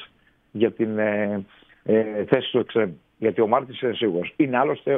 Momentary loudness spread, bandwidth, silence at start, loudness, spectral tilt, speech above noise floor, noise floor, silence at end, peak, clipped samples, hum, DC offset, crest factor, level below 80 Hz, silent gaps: 6 LU; 3.9 kHz; 0 s; -23 LUFS; -9.5 dB/octave; 35 dB; -57 dBFS; 0 s; -2 dBFS; under 0.1%; none; under 0.1%; 20 dB; -66 dBFS; none